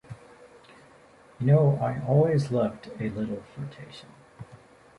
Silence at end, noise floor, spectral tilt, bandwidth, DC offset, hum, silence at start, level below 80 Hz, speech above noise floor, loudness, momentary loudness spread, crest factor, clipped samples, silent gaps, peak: 0.4 s; -54 dBFS; -9 dB/octave; 11 kHz; under 0.1%; none; 0.1 s; -60 dBFS; 29 dB; -25 LUFS; 26 LU; 18 dB; under 0.1%; none; -10 dBFS